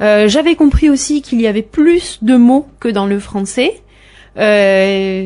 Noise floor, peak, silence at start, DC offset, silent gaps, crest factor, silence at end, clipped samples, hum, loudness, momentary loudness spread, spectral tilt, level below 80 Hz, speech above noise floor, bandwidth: -42 dBFS; -2 dBFS; 0 s; under 0.1%; none; 10 dB; 0 s; under 0.1%; none; -12 LUFS; 8 LU; -5 dB/octave; -28 dBFS; 31 dB; 11 kHz